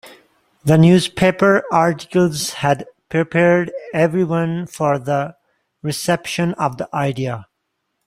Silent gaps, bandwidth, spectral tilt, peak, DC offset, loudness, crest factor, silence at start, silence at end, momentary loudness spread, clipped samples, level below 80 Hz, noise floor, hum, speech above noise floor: none; 15.5 kHz; -6 dB/octave; -2 dBFS; under 0.1%; -17 LUFS; 16 dB; 0.05 s; 0.65 s; 10 LU; under 0.1%; -52 dBFS; -73 dBFS; none; 57 dB